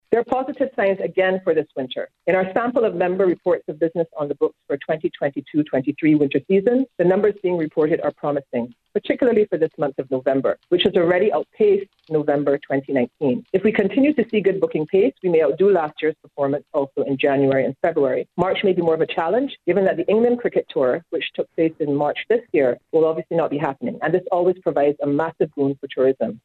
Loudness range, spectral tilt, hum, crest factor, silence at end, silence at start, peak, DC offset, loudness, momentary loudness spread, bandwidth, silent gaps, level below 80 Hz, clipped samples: 2 LU; -8.5 dB/octave; none; 16 dB; 0.05 s; 0.1 s; -4 dBFS; under 0.1%; -20 LUFS; 7 LU; 4.3 kHz; none; -62 dBFS; under 0.1%